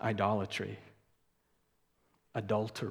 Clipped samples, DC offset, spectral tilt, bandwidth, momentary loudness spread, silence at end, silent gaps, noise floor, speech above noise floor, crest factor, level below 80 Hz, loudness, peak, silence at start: under 0.1%; under 0.1%; -6 dB/octave; 15 kHz; 11 LU; 0 s; none; -76 dBFS; 42 dB; 22 dB; -74 dBFS; -35 LUFS; -16 dBFS; 0 s